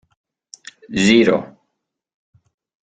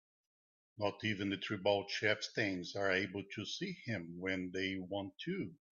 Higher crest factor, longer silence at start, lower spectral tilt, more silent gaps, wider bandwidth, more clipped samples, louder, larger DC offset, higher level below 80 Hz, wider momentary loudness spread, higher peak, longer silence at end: about the same, 20 dB vs 20 dB; first, 0.9 s vs 0.75 s; about the same, -4.5 dB/octave vs -4.5 dB/octave; neither; first, 9.4 kHz vs 7.4 kHz; neither; first, -16 LUFS vs -38 LUFS; neither; first, -56 dBFS vs -78 dBFS; first, 26 LU vs 8 LU; first, -2 dBFS vs -18 dBFS; first, 1.35 s vs 0.25 s